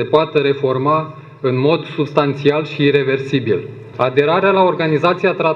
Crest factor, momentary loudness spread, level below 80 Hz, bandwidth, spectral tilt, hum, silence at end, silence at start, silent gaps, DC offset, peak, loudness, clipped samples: 14 dB; 7 LU; -58 dBFS; 7.2 kHz; -8 dB/octave; none; 0 s; 0 s; none; under 0.1%; 0 dBFS; -16 LUFS; under 0.1%